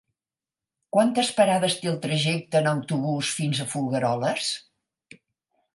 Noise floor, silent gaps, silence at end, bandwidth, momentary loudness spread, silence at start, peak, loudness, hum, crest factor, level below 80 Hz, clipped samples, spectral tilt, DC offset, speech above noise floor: under -90 dBFS; none; 1.15 s; 11.5 kHz; 6 LU; 0.95 s; -6 dBFS; -24 LUFS; none; 20 dB; -70 dBFS; under 0.1%; -4.5 dB/octave; under 0.1%; over 66 dB